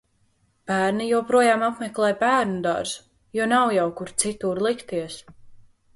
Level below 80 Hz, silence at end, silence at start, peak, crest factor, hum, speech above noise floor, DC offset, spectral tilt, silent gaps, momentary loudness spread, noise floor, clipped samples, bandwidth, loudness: -60 dBFS; 0.35 s; 0.7 s; -4 dBFS; 18 dB; none; 43 dB; under 0.1%; -4 dB/octave; none; 12 LU; -65 dBFS; under 0.1%; 11.5 kHz; -23 LUFS